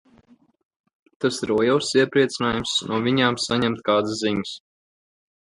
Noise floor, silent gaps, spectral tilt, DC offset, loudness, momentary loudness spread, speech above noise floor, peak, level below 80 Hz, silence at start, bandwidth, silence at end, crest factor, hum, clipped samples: -57 dBFS; none; -4.5 dB/octave; under 0.1%; -22 LUFS; 7 LU; 35 dB; -4 dBFS; -56 dBFS; 1.2 s; 11.5 kHz; 0.85 s; 20 dB; none; under 0.1%